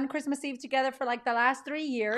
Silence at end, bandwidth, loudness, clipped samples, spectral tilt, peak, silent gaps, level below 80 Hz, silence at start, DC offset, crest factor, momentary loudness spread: 0 s; 13 kHz; -30 LUFS; under 0.1%; -3 dB/octave; -12 dBFS; none; -80 dBFS; 0 s; under 0.1%; 18 dB; 7 LU